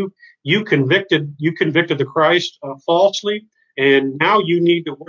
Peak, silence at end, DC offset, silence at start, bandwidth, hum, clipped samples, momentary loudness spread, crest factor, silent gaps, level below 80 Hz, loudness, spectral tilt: -2 dBFS; 0.05 s; under 0.1%; 0 s; 7.4 kHz; none; under 0.1%; 12 LU; 16 dB; none; -66 dBFS; -16 LUFS; -5.5 dB/octave